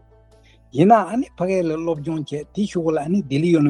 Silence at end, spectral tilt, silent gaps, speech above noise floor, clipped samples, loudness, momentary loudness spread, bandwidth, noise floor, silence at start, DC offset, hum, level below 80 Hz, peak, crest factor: 0 s; -7.5 dB/octave; none; 32 dB; under 0.1%; -20 LUFS; 12 LU; 10.5 kHz; -51 dBFS; 0.75 s; under 0.1%; none; -54 dBFS; -2 dBFS; 18 dB